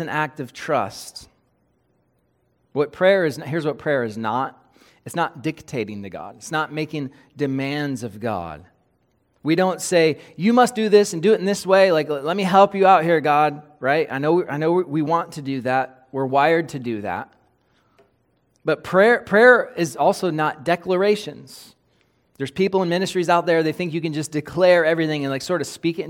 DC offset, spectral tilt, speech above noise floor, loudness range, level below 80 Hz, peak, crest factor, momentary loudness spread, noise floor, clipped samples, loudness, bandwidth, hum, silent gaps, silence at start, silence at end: under 0.1%; -5.5 dB/octave; 46 dB; 9 LU; -62 dBFS; -2 dBFS; 20 dB; 14 LU; -66 dBFS; under 0.1%; -20 LUFS; 17 kHz; none; none; 0 s; 0 s